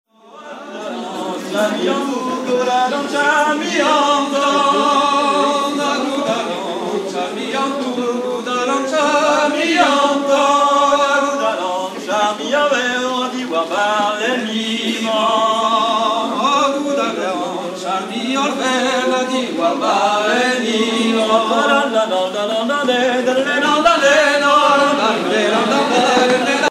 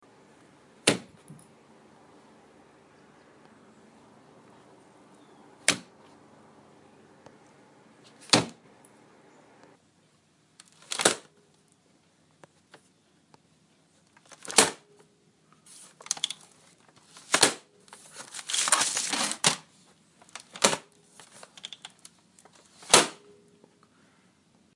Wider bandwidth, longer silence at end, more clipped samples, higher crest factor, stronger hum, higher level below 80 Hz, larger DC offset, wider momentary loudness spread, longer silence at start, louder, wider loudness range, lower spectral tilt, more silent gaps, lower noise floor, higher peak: first, 15 kHz vs 11.5 kHz; second, 0 s vs 1.6 s; neither; second, 14 dB vs 34 dB; neither; first, -62 dBFS vs -74 dBFS; neither; second, 8 LU vs 26 LU; second, 0.35 s vs 0.85 s; first, -16 LUFS vs -25 LUFS; second, 4 LU vs 8 LU; first, -3 dB/octave vs -1 dB/octave; neither; second, -36 dBFS vs -65 dBFS; about the same, -2 dBFS vs 0 dBFS